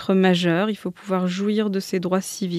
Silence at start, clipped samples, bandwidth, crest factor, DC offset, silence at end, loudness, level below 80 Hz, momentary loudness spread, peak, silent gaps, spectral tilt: 0 s; under 0.1%; 14.5 kHz; 16 dB; under 0.1%; 0 s; -22 LUFS; -70 dBFS; 7 LU; -4 dBFS; none; -6 dB/octave